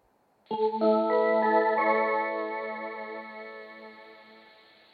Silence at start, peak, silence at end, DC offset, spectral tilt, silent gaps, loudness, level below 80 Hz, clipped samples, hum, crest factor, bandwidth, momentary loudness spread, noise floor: 0.5 s; -12 dBFS; 0.6 s; under 0.1%; -8 dB/octave; none; -27 LUFS; -88 dBFS; under 0.1%; none; 18 dB; 5 kHz; 20 LU; -66 dBFS